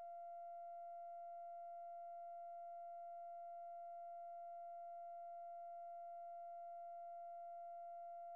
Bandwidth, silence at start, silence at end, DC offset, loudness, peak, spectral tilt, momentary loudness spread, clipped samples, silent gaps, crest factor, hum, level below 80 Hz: 2.8 kHz; 0 s; 0 s; under 0.1%; -54 LUFS; -50 dBFS; 4.5 dB/octave; 0 LU; under 0.1%; none; 4 dB; none; under -90 dBFS